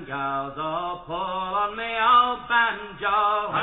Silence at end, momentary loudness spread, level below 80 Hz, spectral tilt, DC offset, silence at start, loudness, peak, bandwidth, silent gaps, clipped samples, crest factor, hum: 0 s; 11 LU; -54 dBFS; -7 dB/octave; under 0.1%; 0 s; -23 LUFS; -8 dBFS; 4.1 kHz; none; under 0.1%; 16 dB; none